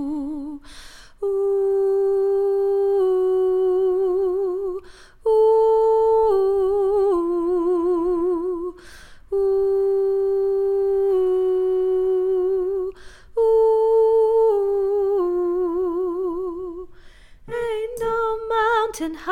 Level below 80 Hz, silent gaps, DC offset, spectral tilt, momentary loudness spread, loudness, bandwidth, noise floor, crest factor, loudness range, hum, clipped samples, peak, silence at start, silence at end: -48 dBFS; none; under 0.1%; -5.5 dB/octave; 11 LU; -20 LUFS; 10.5 kHz; -44 dBFS; 12 dB; 5 LU; none; under 0.1%; -8 dBFS; 0 s; 0 s